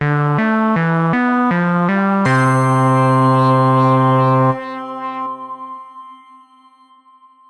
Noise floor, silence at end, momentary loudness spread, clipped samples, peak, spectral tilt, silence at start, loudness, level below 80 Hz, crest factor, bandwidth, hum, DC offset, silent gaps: -48 dBFS; 1.35 s; 14 LU; under 0.1%; -2 dBFS; -8 dB/octave; 0 s; -14 LUFS; -56 dBFS; 12 dB; 11 kHz; none; under 0.1%; none